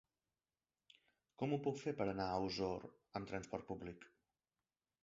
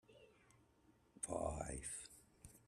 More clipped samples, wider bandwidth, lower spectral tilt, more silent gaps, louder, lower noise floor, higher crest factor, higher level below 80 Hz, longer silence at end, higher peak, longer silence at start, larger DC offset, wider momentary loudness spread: neither; second, 7.6 kHz vs 14.5 kHz; about the same, -5 dB/octave vs -4.5 dB/octave; neither; first, -44 LUFS vs -47 LUFS; first, under -90 dBFS vs -74 dBFS; about the same, 20 dB vs 22 dB; second, -70 dBFS vs -62 dBFS; first, 0.95 s vs 0.1 s; about the same, -26 dBFS vs -28 dBFS; first, 1.4 s vs 0.1 s; neither; second, 10 LU vs 21 LU